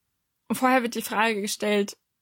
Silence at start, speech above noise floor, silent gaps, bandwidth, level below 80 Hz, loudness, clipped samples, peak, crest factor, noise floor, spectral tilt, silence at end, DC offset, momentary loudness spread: 0.5 s; 52 dB; none; 17 kHz; -74 dBFS; -25 LUFS; under 0.1%; -8 dBFS; 18 dB; -76 dBFS; -3.5 dB/octave; 0.3 s; under 0.1%; 8 LU